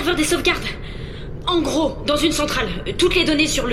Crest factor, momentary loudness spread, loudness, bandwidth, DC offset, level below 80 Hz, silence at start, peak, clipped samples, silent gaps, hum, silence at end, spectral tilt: 16 dB; 14 LU; -19 LUFS; 16 kHz; under 0.1%; -32 dBFS; 0 s; -4 dBFS; under 0.1%; none; none; 0 s; -3.5 dB/octave